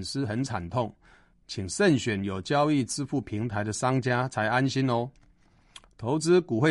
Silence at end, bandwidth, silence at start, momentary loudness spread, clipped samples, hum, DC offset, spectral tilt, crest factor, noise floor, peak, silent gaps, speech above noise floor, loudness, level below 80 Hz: 0 s; 11.5 kHz; 0 s; 9 LU; under 0.1%; none; under 0.1%; -5.5 dB/octave; 18 dB; -60 dBFS; -10 dBFS; none; 34 dB; -27 LUFS; -58 dBFS